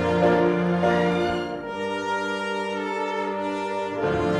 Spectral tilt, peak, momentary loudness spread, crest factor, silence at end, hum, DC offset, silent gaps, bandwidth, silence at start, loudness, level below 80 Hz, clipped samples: -6.5 dB/octave; -8 dBFS; 8 LU; 14 dB; 0 s; none; under 0.1%; none; 10.5 kHz; 0 s; -24 LUFS; -50 dBFS; under 0.1%